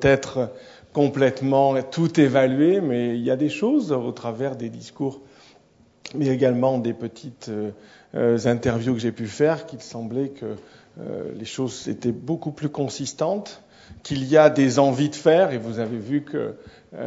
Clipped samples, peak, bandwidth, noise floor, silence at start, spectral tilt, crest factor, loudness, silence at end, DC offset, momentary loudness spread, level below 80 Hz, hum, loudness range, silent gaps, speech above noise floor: under 0.1%; -2 dBFS; 8 kHz; -56 dBFS; 0 s; -6.5 dB/octave; 22 dB; -22 LUFS; 0 s; under 0.1%; 16 LU; -56 dBFS; none; 8 LU; none; 34 dB